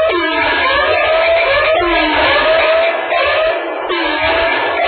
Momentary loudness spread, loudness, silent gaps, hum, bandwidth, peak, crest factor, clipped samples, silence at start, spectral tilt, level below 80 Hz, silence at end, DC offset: 4 LU; -12 LUFS; none; none; 4.7 kHz; -2 dBFS; 10 dB; under 0.1%; 0 s; -9 dB/octave; -38 dBFS; 0 s; under 0.1%